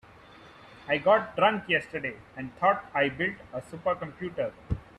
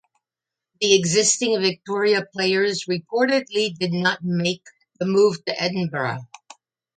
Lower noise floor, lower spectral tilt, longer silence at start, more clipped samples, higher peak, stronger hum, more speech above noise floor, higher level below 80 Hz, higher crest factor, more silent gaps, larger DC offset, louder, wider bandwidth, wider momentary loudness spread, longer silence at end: second, -52 dBFS vs -88 dBFS; first, -6.5 dB/octave vs -3.5 dB/octave; second, 0.45 s vs 0.8 s; neither; second, -10 dBFS vs -4 dBFS; neither; second, 23 dB vs 67 dB; first, -52 dBFS vs -68 dBFS; about the same, 20 dB vs 18 dB; neither; neither; second, -28 LUFS vs -21 LUFS; first, 11.5 kHz vs 9.6 kHz; first, 16 LU vs 8 LU; second, 0.15 s vs 0.75 s